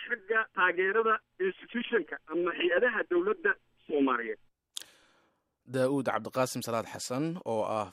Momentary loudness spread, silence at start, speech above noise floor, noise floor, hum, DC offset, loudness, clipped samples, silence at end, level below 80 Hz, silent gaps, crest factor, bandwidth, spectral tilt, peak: 11 LU; 0 s; 42 dB; -72 dBFS; none; under 0.1%; -30 LUFS; under 0.1%; 0 s; -76 dBFS; none; 18 dB; 15 kHz; -4.5 dB/octave; -14 dBFS